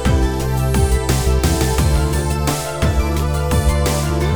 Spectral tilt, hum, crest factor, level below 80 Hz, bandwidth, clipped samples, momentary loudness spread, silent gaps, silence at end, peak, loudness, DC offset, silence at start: -5.5 dB/octave; none; 12 dB; -20 dBFS; over 20 kHz; under 0.1%; 3 LU; none; 0 s; -4 dBFS; -18 LUFS; 1%; 0 s